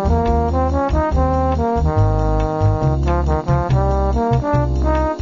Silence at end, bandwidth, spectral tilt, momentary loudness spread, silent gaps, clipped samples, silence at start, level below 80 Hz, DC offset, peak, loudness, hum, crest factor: 0 s; 7.4 kHz; -8.5 dB/octave; 2 LU; none; under 0.1%; 0 s; -20 dBFS; 0.2%; -6 dBFS; -18 LUFS; none; 10 dB